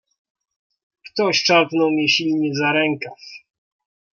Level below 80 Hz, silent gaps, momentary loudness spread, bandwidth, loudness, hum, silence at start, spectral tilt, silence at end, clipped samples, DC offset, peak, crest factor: -70 dBFS; none; 16 LU; 7.2 kHz; -18 LUFS; none; 1.05 s; -4 dB/octave; 0.75 s; under 0.1%; under 0.1%; -2 dBFS; 18 dB